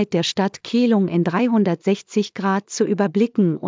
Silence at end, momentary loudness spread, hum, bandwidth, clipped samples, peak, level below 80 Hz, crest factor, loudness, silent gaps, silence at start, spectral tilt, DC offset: 0 s; 4 LU; none; 7.6 kHz; under 0.1%; -4 dBFS; -68 dBFS; 14 dB; -20 LUFS; none; 0 s; -6 dB/octave; under 0.1%